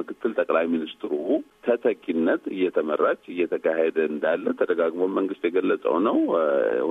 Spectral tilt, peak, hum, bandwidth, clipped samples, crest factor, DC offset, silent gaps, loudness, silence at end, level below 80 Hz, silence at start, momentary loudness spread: -7.5 dB/octave; -8 dBFS; none; 3.9 kHz; under 0.1%; 16 dB; under 0.1%; none; -24 LUFS; 0 s; -72 dBFS; 0 s; 5 LU